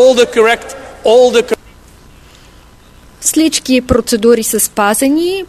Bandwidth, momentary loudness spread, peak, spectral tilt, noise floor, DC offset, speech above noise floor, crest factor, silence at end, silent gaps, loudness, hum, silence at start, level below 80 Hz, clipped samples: 14 kHz; 9 LU; 0 dBFS; -3 dB/octave; -40 dBFS; under 0.1%; 30 dB; 12 dB; 0.05 s; none; -11 LUFS; none; 0 s; -38 dBFS; 0.1%